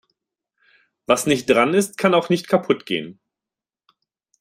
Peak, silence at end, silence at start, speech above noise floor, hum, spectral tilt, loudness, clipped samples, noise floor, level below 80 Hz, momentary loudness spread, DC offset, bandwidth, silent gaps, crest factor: -2 dBFS; 1.3 s; 1.1 s; 70 dB; none; -4.5 dB/octave; -19 LUFS; under 0.1%; -89 dBFS; -60 dBFS; 10 LU; under 0.1%; 16 kHz; none; 20 dB